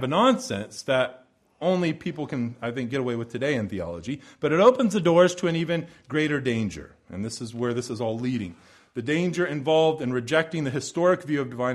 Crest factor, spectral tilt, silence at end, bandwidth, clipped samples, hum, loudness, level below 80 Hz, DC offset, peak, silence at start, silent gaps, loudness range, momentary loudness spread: 20 dB; -5.5 dB/octave; 0 s; 12.5 kHz; under 0.1%; none; -25 LUFS; -60 dBFS; under 0.1%; -4 dBFS; 0 s; none; 6 LU; 13 LU